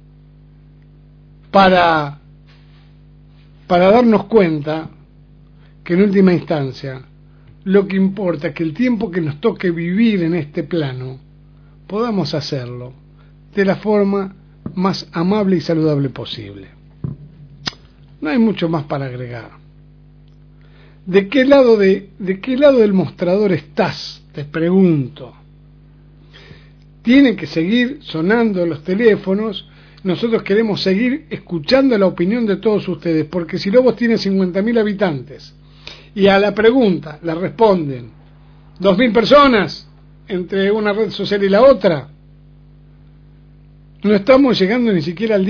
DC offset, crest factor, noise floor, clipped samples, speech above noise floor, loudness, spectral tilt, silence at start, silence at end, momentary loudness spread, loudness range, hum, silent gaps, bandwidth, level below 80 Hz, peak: under 0.1%; 16 dB; -44 dBFS; under 0.1%; 30 dB; -15 LUFS; -7.5 dB/octave; 1.55 s; 0 s; 17 LU; 6 LU; 50 Hz at -45 dBFS; none; 5.4 kHz; -46 dBFS; 0 dBFS